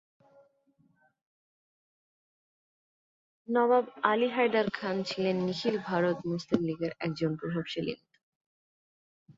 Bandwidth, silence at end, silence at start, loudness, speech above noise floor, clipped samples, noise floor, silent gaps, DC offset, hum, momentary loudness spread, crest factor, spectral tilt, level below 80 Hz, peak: 7.8 kHz; 0.05 s; 3.5 s; -30 LUFS; 40 dB; under 0.1%; -69 dBFS; 8.23-9.26 s; under 0.1%; none; 8 LU; 26 dB; -6.5 dB/octave; -72 dBFS; -8 dBFS